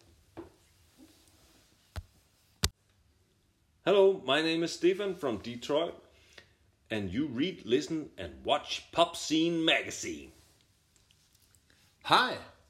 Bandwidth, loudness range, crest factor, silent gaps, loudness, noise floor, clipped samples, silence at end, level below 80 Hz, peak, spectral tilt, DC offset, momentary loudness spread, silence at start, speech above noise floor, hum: 15 kHz; 8 LU; 28 dB; none; -30 LUFS; -70 dBFS; under 0.1%; 0.2 s; -56 dBFS; -6 dBFS; -4 dB/octave; under 0.1%; 19 LU; 0.35 s; 40 dB; none